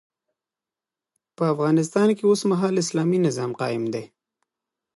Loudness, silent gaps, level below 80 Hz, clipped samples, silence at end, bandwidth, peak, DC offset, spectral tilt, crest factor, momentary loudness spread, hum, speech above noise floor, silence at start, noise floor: -22 LUFS; none; -72 dBFS; under 0.1%; 0.9 s; 11.5 kHz; -8 dBFS; under 0.1%; -6 dB/octave; 16 dB; 7 LU; none; 68 dB; 1.4 s; -90 dBFS